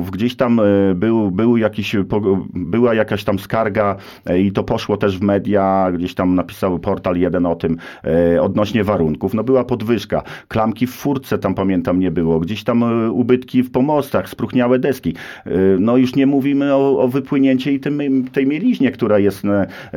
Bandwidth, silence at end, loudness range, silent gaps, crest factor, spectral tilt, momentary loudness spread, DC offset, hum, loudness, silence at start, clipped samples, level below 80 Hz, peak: 16 kHz; 0 s; 3 LU; none; 14 dB; -7.5 dB/octave; 6 LU; 0.1%; none; -17 LUFS; 0 s; under 0.1%; -46 dBFS; -2 dBFS